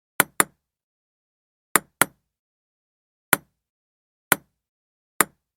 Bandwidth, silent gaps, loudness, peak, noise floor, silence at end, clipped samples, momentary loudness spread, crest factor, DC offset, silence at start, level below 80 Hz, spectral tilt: 19.5 kHz; 0.83-1.75 s, 2.39-3.32 s, 3.69-4.31 s, 4.68-5.20 s; -23 LUFS; 0 dBFS; under -90 dBFS; 0.3 s; under 0.1%; 3 LU; 28 dB; under 0.1%; 0.2 s; -64 dBFS; -1.5 dB/octave